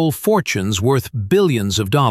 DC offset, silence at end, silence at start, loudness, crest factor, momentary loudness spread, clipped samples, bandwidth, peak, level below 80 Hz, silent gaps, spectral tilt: under 0.1%; 0 s; 0 s; -17 LUFS; 14 dB; 3 LU; under 0.1%; 15 kHz; -2 dBFS; -46 dBFS; none; -5.5 dB/octave